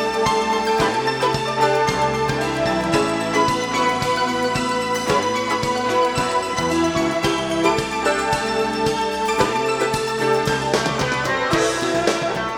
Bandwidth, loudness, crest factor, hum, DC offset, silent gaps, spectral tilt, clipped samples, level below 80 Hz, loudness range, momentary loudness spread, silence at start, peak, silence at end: 18.5 kHz; -20 LUFS; 18 dB; none; under 0.1%; none; -4 dB/octave; under 0.1%; -44 dBFS; 1 LU; 2 LU; 0 s; -2 dBFS; 0 s